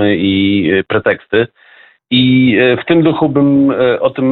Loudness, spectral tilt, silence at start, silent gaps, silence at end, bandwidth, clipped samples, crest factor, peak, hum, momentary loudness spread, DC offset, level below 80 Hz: -12 LUFS; -10.5 dB/octave; 0 s; none; 0 s; 4.4 kHz; under 0.1%; 12 dB; 0 dBFS; none; 5 LU; under 0.1%; -48 dBFS